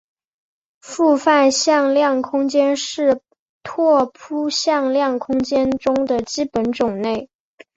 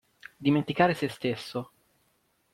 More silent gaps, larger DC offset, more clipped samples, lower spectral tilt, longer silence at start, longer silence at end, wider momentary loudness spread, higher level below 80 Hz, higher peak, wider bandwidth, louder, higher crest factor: first, 3.39-3.61 s vs none; neither; neither; second, -3.5 dB/octave vs -6.5 dB/octave; first, 0.85 s vs 0.4 s; second, 0.5 s vs 0.9 s; second, 10 LU vs 13 LU; first, -56 dBFS vs -66 dBFS; first, -2 dBFS vs -10 dBFS; second, 8 kHz vs 15.5 kHz; first, -18 LUFS vs -28 LUFS; about the same, 16 dB vs 20 dB